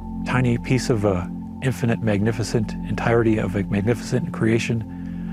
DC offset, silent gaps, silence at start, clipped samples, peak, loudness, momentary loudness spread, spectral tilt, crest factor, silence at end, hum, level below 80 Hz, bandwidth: under 0.1%; none; 0 s; under 0.1%; -2 dBFS; -22 LUFS; 7 LU; -7 dB/octave; 18 dB; 0 s; none; -40 dBFS; 14 kHz